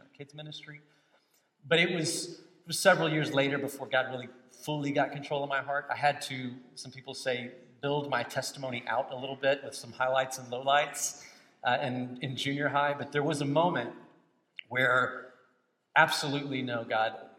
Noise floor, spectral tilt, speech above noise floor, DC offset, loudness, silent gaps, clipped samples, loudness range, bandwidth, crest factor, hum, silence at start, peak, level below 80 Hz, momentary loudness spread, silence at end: -72 dBFS; -4 dB/octave; 41 dB; under 0.1%; -30 LUFS; none; under 0.1%; 4 LU; 16.5 kHz; 24 dB; none; 0.2 s; -8 dBFS; -82 dBFS; 18 LU; 0.1 s